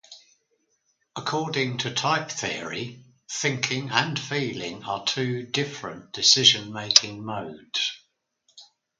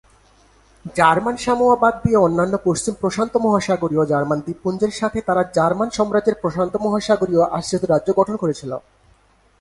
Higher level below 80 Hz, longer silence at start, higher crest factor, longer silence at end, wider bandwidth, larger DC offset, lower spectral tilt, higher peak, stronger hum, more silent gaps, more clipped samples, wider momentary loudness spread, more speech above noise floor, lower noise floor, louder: second, -66 dBFS vs -48 dBFS; second, 0.1 s vs 0.85 s; first, 28 dB vs 18 dB; second, 0.35 s vs 0.8 s; about the same, 11 kHz vs 11.5 kHz; neither; second, -2 dB/octave vs -5.5 dB/octave; about the same, 0 dBFS vs 0 dBFS; neither; neither; neither; first, 15 LU vs 7 LU; first, 46 dB vs 38 dB; first, -72 dBFS vs -56 dBFS; second, -24 LUFS vs -19 LUFS